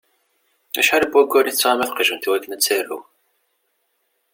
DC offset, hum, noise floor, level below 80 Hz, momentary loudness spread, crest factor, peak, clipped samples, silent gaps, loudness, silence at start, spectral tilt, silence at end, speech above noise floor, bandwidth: under 0.1%; none; -69 dBFS; -64 dBFS; 10 LU; 18 dB; -2 dBFS; under 0.1%; none; -18 LUFS; 0.75 s; -0.5 dB/octave; 1.35 s; 51 dB; 17 kHz